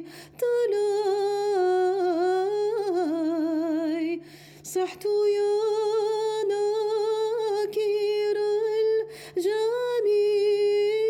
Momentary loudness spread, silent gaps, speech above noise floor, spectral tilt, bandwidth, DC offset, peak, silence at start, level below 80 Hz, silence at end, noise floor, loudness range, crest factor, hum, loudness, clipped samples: 6 LU; none; 21 dB; -4 dB/octave; 14.5 kHz; under 0.1%; -16 dBFS; 0 s; -76 dBFS; 0 s; -45 dBFS; 2 LU; 8 dB; none; -25 LUFS; under 0.1%